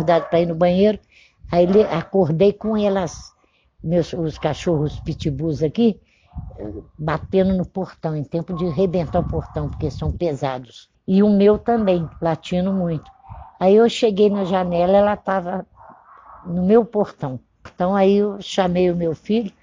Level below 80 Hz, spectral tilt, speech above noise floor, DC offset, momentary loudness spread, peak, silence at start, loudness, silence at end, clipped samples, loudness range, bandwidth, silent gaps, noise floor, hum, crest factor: -42 dBFS; -7.5 dB/octave; 35 dB; under 0.1%; 14 LU; -2 dBFS; 0 s; -19 LUFS; 0.15 s; under 0.1%; 5 LU; 7.6 kHz; none; -53 dBFS; none; 16 dB